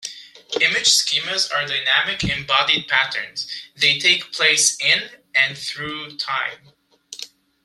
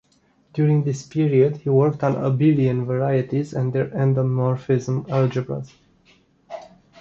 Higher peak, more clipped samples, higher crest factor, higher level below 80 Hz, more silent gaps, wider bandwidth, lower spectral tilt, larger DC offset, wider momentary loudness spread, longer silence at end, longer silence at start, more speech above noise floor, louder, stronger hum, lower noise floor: first, 0 dBFS vs -4 dBFS; neither; first, 22 dB vs 16 dB; about the same, -52 dBFS vs -56 dBFS; neither; first, 15.5 kHz vs 7.6 kHz; second, 0 dB/octave vs -9 dB/octave; neither; about the same, 14 LU vs 14 LU; about the same, 0.4 s vs 0.35 s; second, 0 s vs 0.55 s; second, 19 dB vs 41 dB; first, -18 LUFS vs -21 LUFS; neither; second, -40 dBFS vs -61 dBFS